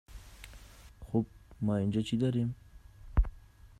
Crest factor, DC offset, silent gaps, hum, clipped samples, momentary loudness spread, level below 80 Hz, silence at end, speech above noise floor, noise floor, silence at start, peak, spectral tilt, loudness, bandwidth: 18 dB; under 0.1%; none; none; under 0.1%; 21 LU; -40 dBFS; 0.15 s; 23 dB; -53 dBFS; 0.1 s; -16 dBFS; -8 dB/octave; -34 LUFS; 13.5 kHz